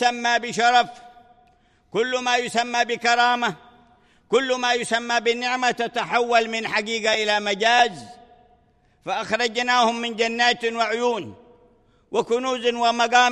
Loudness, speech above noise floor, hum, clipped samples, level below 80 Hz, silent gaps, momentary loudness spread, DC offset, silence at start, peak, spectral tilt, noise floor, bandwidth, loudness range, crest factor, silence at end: -21 LUFS; 39 dB; none; under 0.1%; -66 dBFS; none; 9 LU; under 0.1%; 0 s; -4 dBFS; -2 dB/octave; -60 dBFS; 11.5 kHz; 2 LU; 18 dB; 0 s